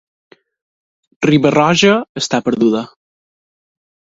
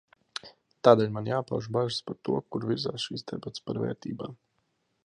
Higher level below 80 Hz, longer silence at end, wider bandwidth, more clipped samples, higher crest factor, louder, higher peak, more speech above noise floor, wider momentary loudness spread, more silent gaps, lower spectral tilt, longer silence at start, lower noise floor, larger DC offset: first, -54 dBFS vs -66 dBFS; first, 1.2 s vs 0.7 s; second, 7.8 kHz vs 10.5 kHz; neither; second, 16 dB vs 26 dB; first, -14 LUFS vs -29 LUFS; first, 0 dBFS vs -4 dBFS; first, over 77 dB vs 47 dB; second, 8 LU vs 19 LU; first, 2.09-2.15 s vs none; about the same, -5 dB/octave vs -6 dB/octave; first, 1.2 s vs 0.45 s; first, under -90 dBFS vs -75 dBFS; neither